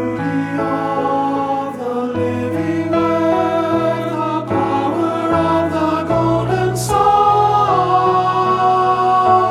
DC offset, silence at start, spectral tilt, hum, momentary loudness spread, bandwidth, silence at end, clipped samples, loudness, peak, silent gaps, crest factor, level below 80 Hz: under 0.1%; 0 s; -6.5 dB/octave; none; 7 LU; 14.5 kHz; 0 s; under 0.1%; -16 LUFS; -2 dBFS; none; 12 dB; -44 dBFS